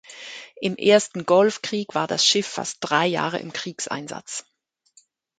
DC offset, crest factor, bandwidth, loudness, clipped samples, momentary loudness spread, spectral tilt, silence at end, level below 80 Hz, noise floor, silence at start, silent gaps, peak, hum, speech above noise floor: under 0.1%; 20 dB; 9.4 kHz; -22 LUFS; under 0.1%; 15 LU; -3 dB/octave; 1 s; -70 dBFS; -61 dBFS; 0.1 s; none; -4 dBFS; none; 39 dB